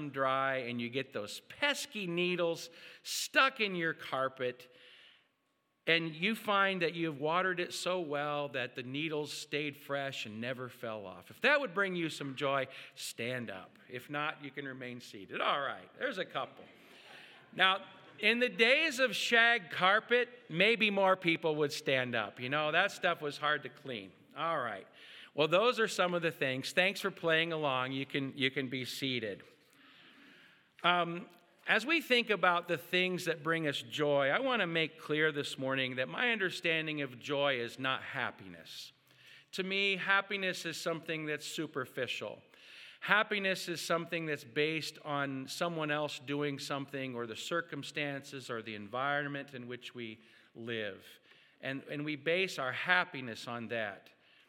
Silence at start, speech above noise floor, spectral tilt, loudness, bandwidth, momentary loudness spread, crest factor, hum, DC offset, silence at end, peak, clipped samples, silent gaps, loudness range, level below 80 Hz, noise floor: 0 s; 44 dB; -4 dB/octave; -33 LUFS; 18 kHz; 15 LU; 24 dB; none; under 0.1%; 0.5 s; -10 dBFS; under 0.1%; none; 9 LU; under -90 dBFS; -79 dBFS